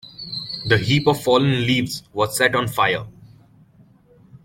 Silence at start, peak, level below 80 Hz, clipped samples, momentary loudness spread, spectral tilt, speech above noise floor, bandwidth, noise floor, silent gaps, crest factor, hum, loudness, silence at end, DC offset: 0.05 s; -2 dBFS; -50 dBFS; under 0.1%; 11 LU; -5 dB/octave; 33 dB; 16.5 kHz; -52 dBFS; none; 20 dB; none; -19 LUFS; 0.1 s; under 0.1%